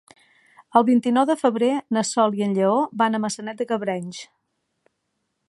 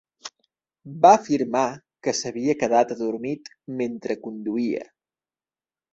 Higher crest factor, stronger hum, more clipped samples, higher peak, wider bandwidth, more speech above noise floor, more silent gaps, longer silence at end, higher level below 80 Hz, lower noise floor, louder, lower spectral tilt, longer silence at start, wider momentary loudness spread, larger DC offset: about the same, 20 dB vs 22 dB; neither; neither; about the same, -2 dBFS vs -2 dBFS; first, 11.5 kHz vs 8.2 kHz; second, 55 dB vs over 68 dB; neither; first, 1.25 s vs 1.1 s; second, -76 dBFS vs -66 dBFS; second, -76 dBFS vs under -90 dBFS; about the same, -21 LUFS vs -23 LUFS; about the same, -5 dB/octave vs -4.5 dB/octave; first, 0.75 s vs 0.25 s; second, 10 LU vs 18 LU; neither